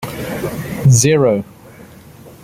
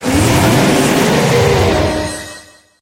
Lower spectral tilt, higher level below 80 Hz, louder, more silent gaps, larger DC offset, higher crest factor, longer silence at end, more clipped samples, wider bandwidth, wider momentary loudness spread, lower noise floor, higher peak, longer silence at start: about the same, -5.5 dB/octave vs -5 dB/octave; second, -44 dBFS vs -30 dBFS; second, -15 LUFS vs -12 LUFS; neither; neither; about the same, 16 dB vs 12 dB; second, 0.1 s vs 0.4 s; neither; about the same, 16 kHz vs 16 kHz; about the same, 13 LU vs 11 LU; about the same, -39 dBFS vs -37 dBFS; about the same, 0 dBFS vs -2 dBFS; about the same, 0 s vs 0 s